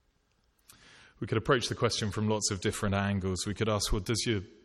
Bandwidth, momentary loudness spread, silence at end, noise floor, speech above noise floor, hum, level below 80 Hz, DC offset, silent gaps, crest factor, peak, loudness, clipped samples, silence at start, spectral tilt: 14 kHz; 5 LU; 0.15 s; -72 dBFS; 41 dB; none; -46 dBFS; under 0.1%; none; 20 dB; -12 dBFS; -30 LUFS; under 0.1%; 1.2 s; -4.5 dB/octave